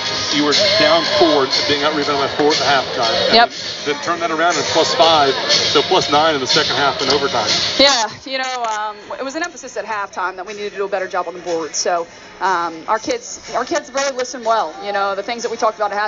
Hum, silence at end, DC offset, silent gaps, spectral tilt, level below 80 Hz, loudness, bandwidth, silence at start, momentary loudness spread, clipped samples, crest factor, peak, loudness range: none; 0 s; under 0.1%; none; -0.5 dB/octave; -54 dBFS; -16 LUFS; 7.6 kHz; 0 s; 12 LU; under 0.1%; 16 dB; 0 dBFS; 8 LU